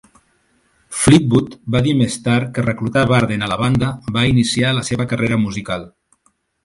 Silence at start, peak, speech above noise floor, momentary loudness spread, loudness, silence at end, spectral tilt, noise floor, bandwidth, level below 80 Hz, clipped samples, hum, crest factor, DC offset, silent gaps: 0.9 s; 0 dBFS; 46 dB; 8 LU; -17 LUFS; 0.75 s; -5.5 dB/octave; -62 dBFS; 11.5 kHz; -42 dBFS; under 0.1%; none; 18 dB; under 0.1%; none